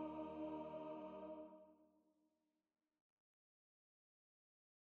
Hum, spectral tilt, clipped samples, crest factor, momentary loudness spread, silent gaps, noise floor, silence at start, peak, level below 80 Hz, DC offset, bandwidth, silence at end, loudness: none; -6 dB/octave; under 0.1%; 18 dB; 10 LU; none; -88 dBFS; 0 s; -38 dBFS; -84 dBFS; under 0.1%; 4.5 kHz; 2.95 s; -52 LUFS